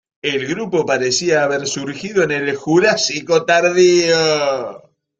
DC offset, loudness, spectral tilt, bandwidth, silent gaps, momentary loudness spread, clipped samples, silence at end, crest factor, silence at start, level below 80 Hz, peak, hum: under 0.1%; -16 LUFS; -3.5 dB/octave; 8.4 kHz; none; 9 LU; under 0.1%; 0.4 s; 16 dB; 0.25 s; -58 dBFS; -2 dBFS; none